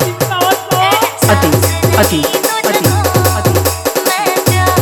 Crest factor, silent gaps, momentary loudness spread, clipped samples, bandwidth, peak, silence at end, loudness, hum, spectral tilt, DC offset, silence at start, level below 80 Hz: 12 dB; none; 3 LU; under 0.1%; 19.5 kHz; 0 dBFS; 0 s; -11 LUFS; none; -4 dB/octave; under 0.1%; 0 s; -34 dBFS